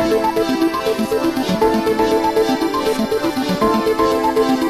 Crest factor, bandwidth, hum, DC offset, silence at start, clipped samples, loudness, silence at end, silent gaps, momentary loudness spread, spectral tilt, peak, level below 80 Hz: 14 dB; 14.5 kHz; none; under 0.1%; 0 s; under 0.1%; -17 LUFS; 0 s; none; 3 LU; -5 dB/octave; -4 dBFS; -42 dBFS